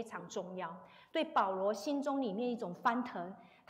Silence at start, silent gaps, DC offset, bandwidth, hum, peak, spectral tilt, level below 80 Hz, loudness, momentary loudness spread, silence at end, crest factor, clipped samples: 0 s; none; under 0.1%; 16 kHz; none; -20 dBFS; -5 dB/octave; -84 dBFS; -37 LUFS; 12 LU; 0.25 s; 18 dB; under 0.1%